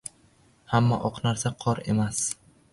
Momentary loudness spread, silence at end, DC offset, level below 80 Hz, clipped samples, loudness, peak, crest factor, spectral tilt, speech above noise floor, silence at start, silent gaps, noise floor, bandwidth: 7 LU; 0.4 s; under 0.1%; -54 dBFS; under 0.1%; -26 LUFS; -8 dBFS; 20 dB; -5 dB/octave; 35 dB; 0.05 s; none; -60 dBFS; 11.5 kHz